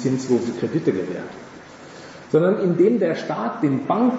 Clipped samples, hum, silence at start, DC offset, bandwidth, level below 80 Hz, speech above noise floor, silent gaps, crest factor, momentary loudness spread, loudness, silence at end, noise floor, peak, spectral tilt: under 0.1%; none; 0 s; under 0.1%; 8 kHz; -66 dBFS; 20 dB; none; 16 dB; 22 LU; -21 LUFS; 0 s; -41 dBFS; -6 dBFS; -7.5 dB/octave